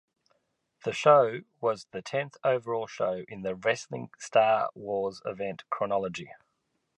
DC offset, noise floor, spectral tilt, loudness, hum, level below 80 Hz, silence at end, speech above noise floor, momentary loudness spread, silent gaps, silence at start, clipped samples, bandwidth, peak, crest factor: under 0.1%; -78 dBFS; -5 dB/octave; -29 LUFS; none; -70 dBFS; 0.6 s; 49 dB; 14 LU; none; 0.85 s; under 0.1%; 10.5 kHz; -8 dBFS; 22 dB